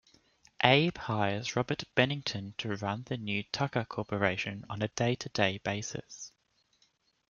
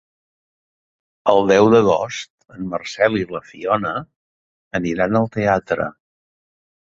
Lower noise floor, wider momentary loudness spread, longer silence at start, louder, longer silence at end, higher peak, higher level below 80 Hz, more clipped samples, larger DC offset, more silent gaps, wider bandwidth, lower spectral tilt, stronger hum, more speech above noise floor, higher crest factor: second, -73 dBFS vs under -90 dBFS; second, 11 LU vs 15 LU; second, 0.6 s vs 1.25 s; second, -31 LUFS vs -18 LUFS; about the same, 1 s vs 0.95 s; second, -6 dBFS vs 0 dBFS; second, -66 dBFS vs -52 dBFS; neither; neither; second, none vs 2.30-2.38 s, 4.16-4.71 s; about the same, 7.4 kHz vs 7.8 kHz; second, -4.5 dB/octave vs -6 dB/octave; neither; second, 42 dB vs over 72 dB; first, 28 dB vs 20 dB